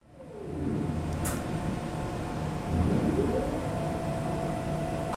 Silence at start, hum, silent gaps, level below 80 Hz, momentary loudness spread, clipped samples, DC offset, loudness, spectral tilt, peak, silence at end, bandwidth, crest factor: 0.1 s; none; none; -42 dBFS; 7 LU; under 0.1%; under 0.1%; -31 LUFS; -7 dB/octave; -16 dBFS; 0 s; 16 kHz; 16 dB